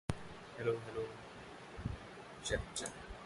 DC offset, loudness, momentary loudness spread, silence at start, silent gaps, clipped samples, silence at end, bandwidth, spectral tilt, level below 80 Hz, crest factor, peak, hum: under 0.1%; -44 LUFS; 12 LU; 0.1 s; none; under 0.1%; 0 s; 11.5 kHz; -4 dB/octave; -54 dBFS; 24 dB; -18 dBFS; none